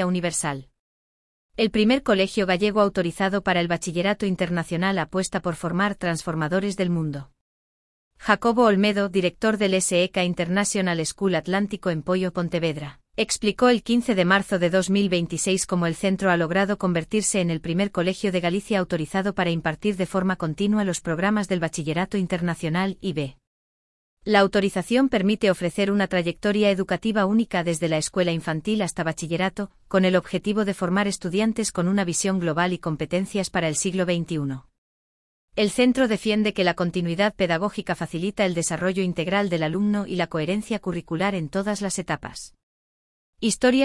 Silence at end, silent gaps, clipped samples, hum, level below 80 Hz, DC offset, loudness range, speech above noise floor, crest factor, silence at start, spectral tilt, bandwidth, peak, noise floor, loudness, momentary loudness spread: 0 s; 0.79-1.49 s, 7.41-8.11 s, 23.47-24.17 s, 34.78-35.48 s, 42.63-43.33 s; under 0.1%; none; -52 dBFS; under 0.1%; 4 LU; over 67 dB; 20 dB; 0 s; -5 dB/octave; 12 kHz; -4 dBFS; under -90 dBFS; -23 LUFS; 7 LU